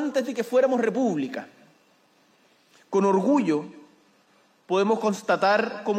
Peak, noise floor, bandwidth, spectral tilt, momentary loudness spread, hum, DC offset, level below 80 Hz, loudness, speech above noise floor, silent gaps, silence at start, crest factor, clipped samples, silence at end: -8 dBFS; -62 dBFS; 15.5 kHz; -6 dB/octave; 8 LU; none; under 0.1%; -84 dBFS; -24 LUFS; 38 dB; none; 0 s; 16 dB; under 0.1%; 0 s